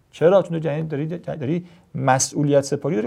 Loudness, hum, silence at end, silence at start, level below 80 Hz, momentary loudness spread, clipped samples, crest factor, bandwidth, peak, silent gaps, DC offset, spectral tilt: -21 LUFS; none; 0 s; 0.15 s; -62 dBFS; 11 LU; under 0.1%; 18 dB; 15 kHz; -2 dBFS; none; under 0.1%; -5.5 dB/octave